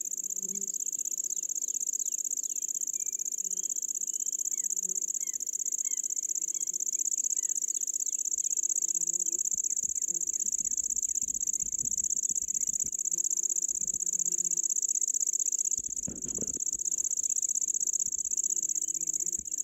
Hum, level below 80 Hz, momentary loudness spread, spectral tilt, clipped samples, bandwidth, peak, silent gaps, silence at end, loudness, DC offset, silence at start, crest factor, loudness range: none; -68 dBFS; 4 LU; 0 dB/octave; under 0.1%; 16 kHz; -18 dBFS; none; 0 s; -28 LUFS; under 0.1%; 0 s; 14 dB; 3 LU